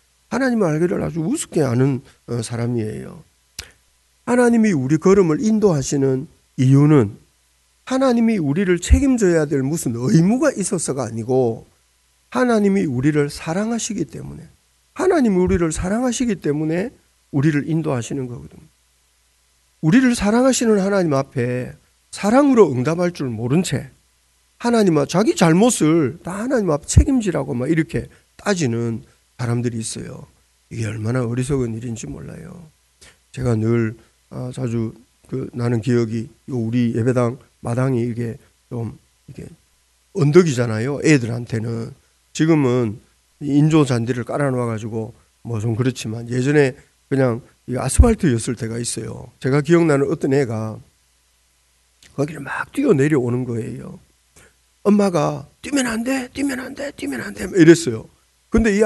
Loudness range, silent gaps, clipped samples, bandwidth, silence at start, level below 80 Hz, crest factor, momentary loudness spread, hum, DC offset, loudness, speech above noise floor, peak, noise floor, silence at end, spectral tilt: 7 LU; none; under 0.1%; 12 kHz; 0.3 s; -34 dBFS; 20 dB; 16 LU; none; under 0.1%; -19 LUFS; 42 dB; 0 dBFS; -60 dBFS; 0 s; -6.5 dB/octave